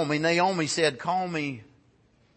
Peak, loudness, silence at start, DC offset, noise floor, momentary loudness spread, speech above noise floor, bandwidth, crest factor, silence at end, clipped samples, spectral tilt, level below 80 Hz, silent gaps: -10 dBFS; -26 LUFS; 0 s; under 0.1%; -63 dBFS; 10 LU; 37 dB; 8.8 kHz; 18 dB; 0.75 s; under 0.1%; -4 dB/octave; -68 dBFS; none